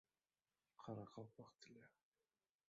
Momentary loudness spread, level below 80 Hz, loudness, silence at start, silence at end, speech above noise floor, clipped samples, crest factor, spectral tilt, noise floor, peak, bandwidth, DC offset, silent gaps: 11 LU; under -90 dBFS; -59 LUFS; 0.8 s; 0.8 s; over 32 dB; under 0.1%; 22 dB; -6.5 dB/octave; under -90 dBFS; -40 dBFS; 7.4 kHz; under 0.1%; none